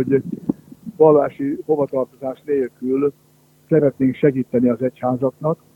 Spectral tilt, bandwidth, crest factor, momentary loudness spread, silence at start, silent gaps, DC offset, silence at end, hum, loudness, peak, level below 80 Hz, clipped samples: -10 dB/octave; 3.9 kHz; 18 dB; 11 LU; 0 s; none; under 0.1%; 0.2 s; none; -19 LUFS; 0 dBFS; -58 dBFS; under 0.1%